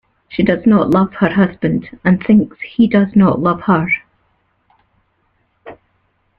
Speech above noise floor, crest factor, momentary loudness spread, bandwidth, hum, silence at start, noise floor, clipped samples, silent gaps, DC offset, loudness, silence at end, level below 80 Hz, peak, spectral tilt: 49 dB; 14 dB; 7 LU; 4.6 kHz; none; 0.3 s; -62 dBFS; under 0.1%; none; under 0.1%; -14 LUFS; 0.65 s; -48 dBFS; -2 dBFS; -9.5 dB/octave